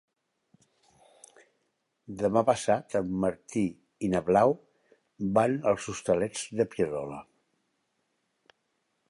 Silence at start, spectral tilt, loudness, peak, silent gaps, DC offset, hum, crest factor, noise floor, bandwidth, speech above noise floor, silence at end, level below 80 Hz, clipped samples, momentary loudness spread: 2.1 s; -6 dB/octave; -28 LUFS; -8 dBFS; none; under 0.1%; none; 22 dB; -77 dBFS; 11.5 kHz; 50 dB; 1.9 s; -62 dBFS; under 0.1%; 11 LU